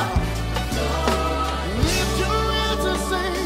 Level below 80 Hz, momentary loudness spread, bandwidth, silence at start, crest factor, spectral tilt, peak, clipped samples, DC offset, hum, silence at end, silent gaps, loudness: -28 dBFS; 3 LU; 16 kHz; 0 s; 18 dB; -4.5 dB/octave; -4 dBFS; under 0.1%; under 0.1%; none; 0 s; none; -22 LUFS